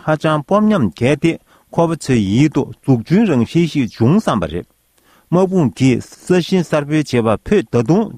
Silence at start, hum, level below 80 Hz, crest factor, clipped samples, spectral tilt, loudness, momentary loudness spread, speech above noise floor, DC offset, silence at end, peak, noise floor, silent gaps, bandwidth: 0.05 s; none; -44 dBFS; 14 dB; under 0.1%; -7 dB/octave; -15 LUFS; 5 LU; 39 dB; under 0.1%; 0 s; 0 dBFS; -54 dBFS; none; 14 kHz